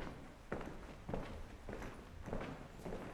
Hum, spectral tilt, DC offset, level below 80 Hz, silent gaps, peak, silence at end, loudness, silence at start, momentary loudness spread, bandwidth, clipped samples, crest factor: none; -6.5 dB/octave; under 0.1%; -52 dBFS; none; -28 dBFS; 0 s; -49 LUFS; 0 s; 6 LU; 15.5 kHz; under 0.1%; 20 dB